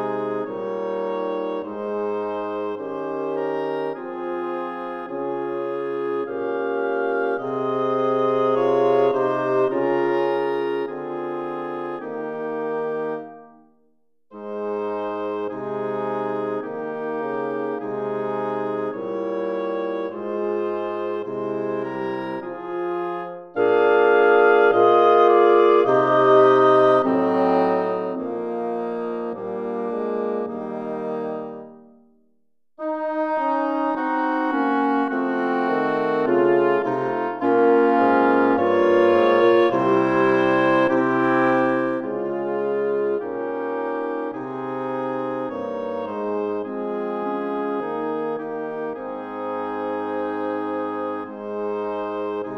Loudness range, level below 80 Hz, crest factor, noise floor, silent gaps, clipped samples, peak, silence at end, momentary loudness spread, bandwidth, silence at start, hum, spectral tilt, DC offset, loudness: 11 LU; -70 dBFS; 18 dB; -72 dBFS; none; under 0.1%; -4 dBFS; 0 s; 13 LU; 6.4 kHz; 0 s; none; -7.5 dB/octave; under 0.1%; -22 LUFS